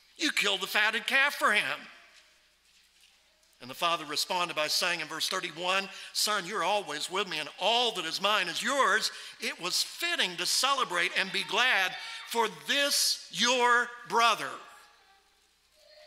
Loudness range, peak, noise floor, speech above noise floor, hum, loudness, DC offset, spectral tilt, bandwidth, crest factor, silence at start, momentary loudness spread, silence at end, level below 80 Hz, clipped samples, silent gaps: 5 LU; -10 dBFS; -67 dBFS; 38 dB; none; -28 LUFS; under 0.1%; -0.5 dB/octave; 16 kHz; 20 dB; 0.2 s; 8 LU; 0 s; -80 dBFS; under 0.1%; none